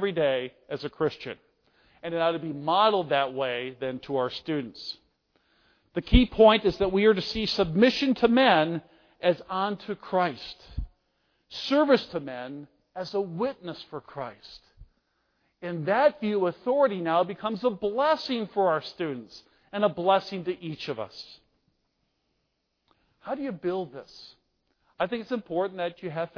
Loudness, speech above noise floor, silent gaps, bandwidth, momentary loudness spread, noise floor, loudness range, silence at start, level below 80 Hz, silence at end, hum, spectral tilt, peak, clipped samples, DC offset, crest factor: -26 LUFS; 51 dB; none; 5.4 kHz; 18 LU; -77 dBFS; 13 LU; 0 s; -44 dBFS; 0.1 s; none; -6.5 dB/octave; -6 dBFS; under 0.1%; under 0.1%; 22 dB